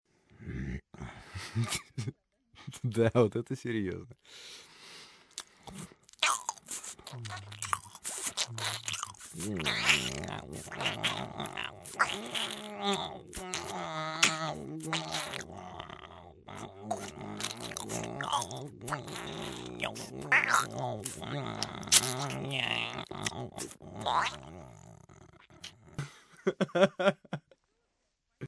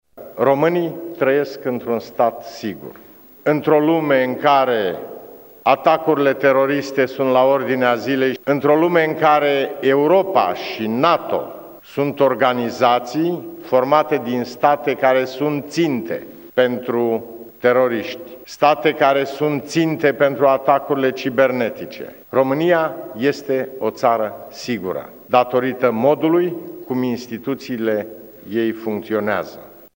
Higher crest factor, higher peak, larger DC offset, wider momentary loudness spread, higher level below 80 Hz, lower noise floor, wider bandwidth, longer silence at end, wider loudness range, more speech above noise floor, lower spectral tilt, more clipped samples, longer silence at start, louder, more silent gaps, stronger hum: first, 28 dB vs 18 dB; second, -8 dBFS vs 0 dBFS; neither; first, 20 LU vs 12 LU; first, -60 dBFS vs -66 dBFS; first, -80 dBFS vs -39 dBFS; second, 11 kHz vs 16.5 kHz; second, 0 s vs 0.25 s; first, 8 LU vs 4 LU; first, 47 dB vs 22 dB; second, -3 dB/octave vs -6 dB/octave; neither; first, 0.35 s vs 0.15 s; second, -33 LUFS vs -18 LUFS; neither; neither